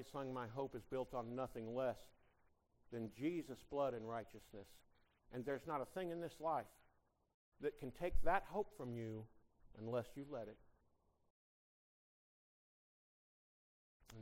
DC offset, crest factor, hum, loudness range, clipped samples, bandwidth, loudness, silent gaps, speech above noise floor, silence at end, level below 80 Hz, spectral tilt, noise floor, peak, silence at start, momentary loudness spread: under 0.1%; 24 dB; none; 8 LU; under 0.1%; 16 kHz; -46 LUFS; 7.34-7.52 s, 11.30-14.00 s; 35 dB; 0 s; -58 dBFS; -7 dB/octave; -79 dBFS; -22 dBFS; 0 s; 13 LU